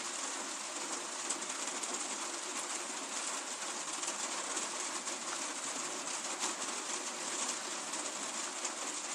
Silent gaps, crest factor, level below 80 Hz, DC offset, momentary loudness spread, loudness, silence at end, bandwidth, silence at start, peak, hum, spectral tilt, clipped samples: none; 18 dB; under -90 dBFS; under 0.1%; 2 LU; -37 LUFS; 0 s; 15.5 kHz; 0 s; -20 dBFS; none; 0.5 dB/octave; under 0.1%